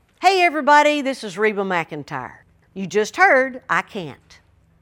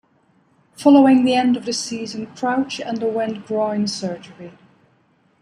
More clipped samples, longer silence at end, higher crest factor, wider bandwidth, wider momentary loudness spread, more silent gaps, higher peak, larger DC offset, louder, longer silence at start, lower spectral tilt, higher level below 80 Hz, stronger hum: neither; second, 0.65 s vs 0.95 s; about the same, 20 dB vs 18 dB; first, 17 kHz vs 11 kHz; about the same, 18 LU vs 16 LU; neither; about the same, 0 dBFS vs -2 dBFS; neither; about the same, -18 LUFS vs -19 LUFS; second, 0.2 s vs 0.8 s; about the same, -4 dB/octave vs -4.5 dB/octave; about the same, -62 dBFS vs -66 dBFS; neither